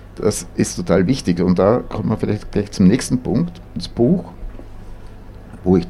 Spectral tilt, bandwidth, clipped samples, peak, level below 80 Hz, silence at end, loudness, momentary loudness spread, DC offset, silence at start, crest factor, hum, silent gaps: -6.5 dB/octave; 13.5 kHz; under 0.1%; -2 dBFS; -36 dBFS; 0 s; -18 LUFS; 16 LU; under 0.1%; 0 s; 16 dB; none; none